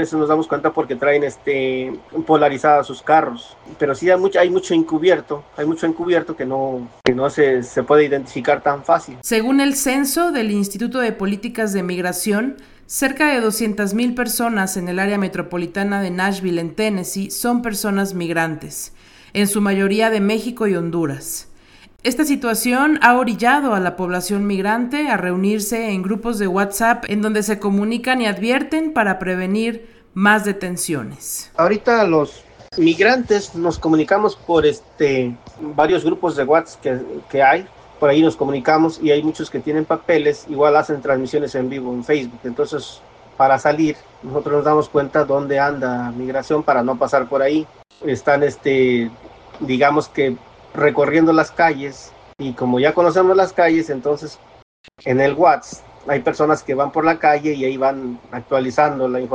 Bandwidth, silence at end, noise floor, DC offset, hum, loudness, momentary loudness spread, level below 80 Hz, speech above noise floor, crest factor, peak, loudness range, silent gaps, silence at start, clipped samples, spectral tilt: 18 kHz; 0 s; -46 dBFS; under 0.1%; none; -18 LUFS; 10 LU; -50 dBFS; 29 dB; 18 dB; 0 dBFS; 3 LU; 54.62-54.84 s; 0 s; under 0.1%; -5 dB/octave